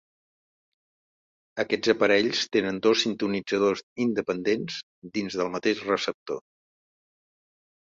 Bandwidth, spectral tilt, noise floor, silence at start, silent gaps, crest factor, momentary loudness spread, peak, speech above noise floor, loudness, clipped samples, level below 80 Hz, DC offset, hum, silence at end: 7.8 kHz; -4 dB/octave; under -90 dBFS; 1.55 s; 3.83-3.96 s, 4.83-5.02 s, 6.14-6.26 s; 20 dB; 13 LU; -6 dBFS; over 64 dB; -26 LUFS; under 0.1%; -66 dBFS; under 0.1%; none; 1.55 s